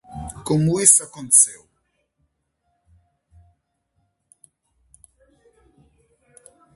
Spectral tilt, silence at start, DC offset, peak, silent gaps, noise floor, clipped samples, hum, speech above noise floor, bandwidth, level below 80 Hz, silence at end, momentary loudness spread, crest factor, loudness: -4 dB/octave; 0.1 s; under 0.1%; 0 dBFS; none; -72 dBFS; under 0.1%; none; 55 dB; 12 kHz; -52 dBFS; 5.2 s; 16 LU; 24 dB; -15 LUFS